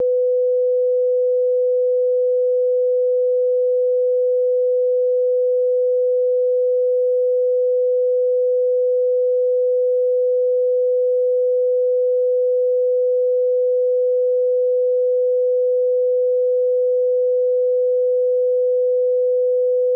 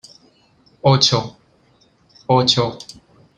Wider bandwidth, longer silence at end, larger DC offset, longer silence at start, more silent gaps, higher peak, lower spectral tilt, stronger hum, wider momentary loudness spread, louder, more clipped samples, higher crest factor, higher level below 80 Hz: second, 0.6 kHz vs 9.6 kHz; second, 0 s vs 0.55 s; neither; second, 0 s vs 0.85 s; neither; second, -14 dBFS vs 0 dBFS; first, -8 dB/octave vs -4.5 dB/octave; neither; second, 0 LU vs 22 LU; about the same, -18 LUFS vs -16 LUFS; neither; second, 4 dB vs 20 dB; second, under -90 dBFS vs -54 dBFS